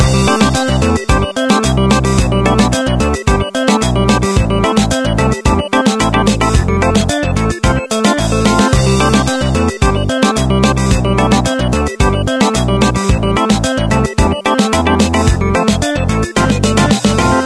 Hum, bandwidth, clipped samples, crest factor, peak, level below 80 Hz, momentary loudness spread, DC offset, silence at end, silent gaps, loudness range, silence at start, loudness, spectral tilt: none; 11 kHz; under 0.1%; 12 dB; 0 dBFS; -20 dBFS; 3 LU; under 0.1%; 0 s; none; 1 LU; 0 s; -12 LUFS; -5 dB/octave